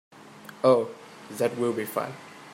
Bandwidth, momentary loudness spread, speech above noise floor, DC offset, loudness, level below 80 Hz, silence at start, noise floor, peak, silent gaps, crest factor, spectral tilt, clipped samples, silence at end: 16 kHz; 23 LU; 22 dB; under 0.1%; -27 LUFS; -76 dBFS; 0.15 s; -47 dBFS; -8 dBFS; none; 20 dB; -5.5 dB/octave; under 0.1%; 0 s